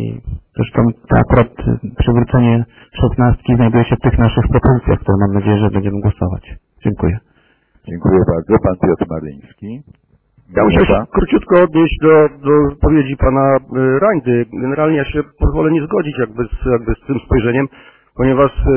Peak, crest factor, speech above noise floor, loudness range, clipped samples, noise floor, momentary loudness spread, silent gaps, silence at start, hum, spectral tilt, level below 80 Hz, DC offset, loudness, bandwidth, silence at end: 0 dBFS; 14 dB; 41 dB; 5 LU; under 0.1%; -54 dBFS; 10 LU; none; 0 s; none; -12 dB/octave; -24 dBFS; under 0.1%; -14 LUFS; 3.4 kHz; 0 s